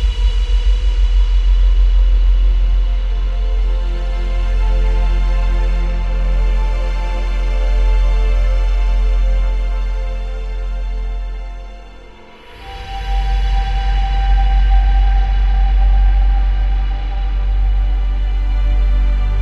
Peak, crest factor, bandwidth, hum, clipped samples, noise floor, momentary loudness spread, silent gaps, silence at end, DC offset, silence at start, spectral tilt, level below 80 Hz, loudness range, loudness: -4 dBFS; 10 dB; 5.2 kHz; none; under 0.1%; -37 dBFS; 9 LU; none; 0 s; under 0.1%; 0 s; -6.5 dB/octave; -14 dBFS; 7 LU; -18 LUFS